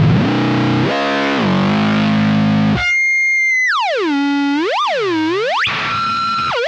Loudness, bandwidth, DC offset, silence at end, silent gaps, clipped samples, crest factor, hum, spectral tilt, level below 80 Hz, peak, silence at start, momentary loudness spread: -14 LUFS; 8.8 kHz; under 0.1%; 0 s; none; under 0.1%; 12 dB; none; -5.5 dB/octave; -44 dBFS; -2 dBFS; 0 s; 5 LU